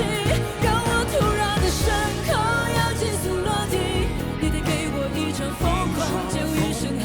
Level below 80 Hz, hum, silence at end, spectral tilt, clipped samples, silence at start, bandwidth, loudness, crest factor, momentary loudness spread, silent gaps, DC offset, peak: -32 dBFS; none; 0 s; -5 dB/octave; under 0.1%; 0 s; over 20 kHz; -23 LUFS; 14 dB; 4 LU; none; under 0.1%; -10 dBFS